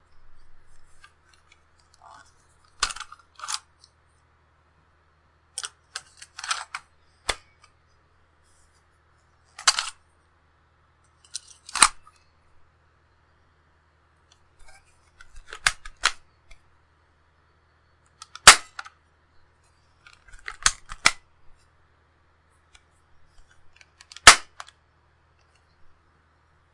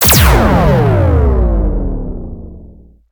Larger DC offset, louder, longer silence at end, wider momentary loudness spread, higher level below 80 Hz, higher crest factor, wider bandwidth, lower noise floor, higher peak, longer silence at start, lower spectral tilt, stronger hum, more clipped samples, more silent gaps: neither; second, -20 LUFS vs -11 LUFS; first, 2.3 s vs 0.45 s; first, 30 LU vs 19 LU; second, -50 dBFS vs -16 dBFS; first, 28 dB vs 12 dB; second, 12 kHz vs over 20 kHz; first, -63 dBFS vs -38 dBFS; about the same, 0 dBFS vs 0 dBFS; first, 2.8 s vs 0 s; second, 1 dB/octave vs -5 dB/octave; neither; neither; neither